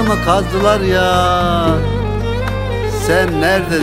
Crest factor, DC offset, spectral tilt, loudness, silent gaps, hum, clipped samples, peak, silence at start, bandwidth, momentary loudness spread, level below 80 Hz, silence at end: 14 dB; under 0.1%; -5.5 dB/octave; -15 LUFS; none; none; under 0.1%; 0 dBFS; 0 s; 16 kHz; 6 LU; -26 dBFS; 0 s